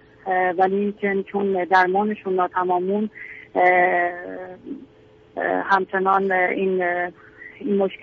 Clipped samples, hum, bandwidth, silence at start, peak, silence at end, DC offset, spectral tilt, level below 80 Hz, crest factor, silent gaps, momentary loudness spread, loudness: under 0.1%; none; 6.6 kHz; 0.25 s; -4 dBFS; 0.05 s; under 0.1%; -4.5 dB/octave; -64 dBFS; 18 dB; none; 18 LU; -21 LUFS